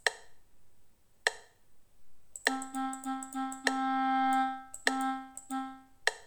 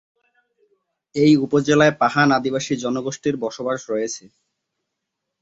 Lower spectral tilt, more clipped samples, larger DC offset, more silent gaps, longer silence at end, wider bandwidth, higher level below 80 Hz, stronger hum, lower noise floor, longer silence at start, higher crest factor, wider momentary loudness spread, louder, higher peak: second, -0.5 dB/octave vs -5 dB/octave; neither; neither; neither; second, 0 s vs 1.25 s; first, 19 kHz vs 8 kHz; second, -72 dBFS vs -60 dBFS; neither; second, -59 dBFS vs -80 dBFS; second, 0.05 s vs 1.15 s; first, 26 dB vs 20 dB; about the same, 11 LU vs 11 LU; second, -33 LUFS vs -19 LUFS; second, -10 dBFS vs -2 dBFS